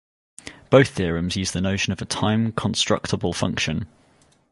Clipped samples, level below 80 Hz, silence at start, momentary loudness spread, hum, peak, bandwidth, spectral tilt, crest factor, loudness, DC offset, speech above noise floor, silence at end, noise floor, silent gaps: under 0.1%; -42 dBFS; 0.45 s; 16 LU; none; -2 dBFS; 11.5 kHz; -4.5 dB/octave; 22 dB; -22 LUFS; under 0.1%; 37 dB; 0.65 s; -58 dBFS; none